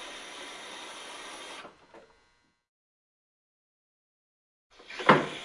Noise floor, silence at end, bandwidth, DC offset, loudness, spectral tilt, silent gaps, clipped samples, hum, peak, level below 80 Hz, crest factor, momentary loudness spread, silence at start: -69 dBFS; 0 s; 11.5 kHz; under 0.1%; -30 LUFS; -4.5 dB/octave; 2.68-4.70 s; under 0.1%; none; -4 dBFS; -72 dBFS; 30 dB; 21 LU; 0 s